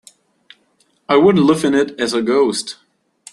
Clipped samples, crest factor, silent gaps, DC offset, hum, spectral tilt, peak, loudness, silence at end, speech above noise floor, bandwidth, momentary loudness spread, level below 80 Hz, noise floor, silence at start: under 0.1%; 16 dB; none; under 0.1%; none; -5 dB/octave; -2 dBFS; -15 LUFS; 0.6 s; 46 dB; 12.5 kHz; 13 LU; -58 dBFS; -60 dBFS; 1.1 s